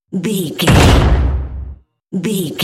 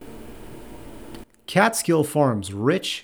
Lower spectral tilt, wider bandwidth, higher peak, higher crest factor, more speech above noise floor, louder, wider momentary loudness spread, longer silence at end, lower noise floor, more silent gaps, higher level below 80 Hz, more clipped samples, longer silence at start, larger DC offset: about the same, -5.5 dB/octave vs -4.5 dB/octave; second, 16 kHz vs over 20 kHz; first, 0 dBFS vs -4 dBFS; second, 14 dB vs 20 dB; about the same, 22 dB vs 21 dB; first, -14 LUFS vs -21 LUFS; second, 18 LU vs 22 LU; about the same, 0 s vs 0 s; second, -34 dBFS vs -42 dBFS; neither; first, -18 dBFS vs -50 dBFS; neither; about the same, 0.1 s vs 0 s; neither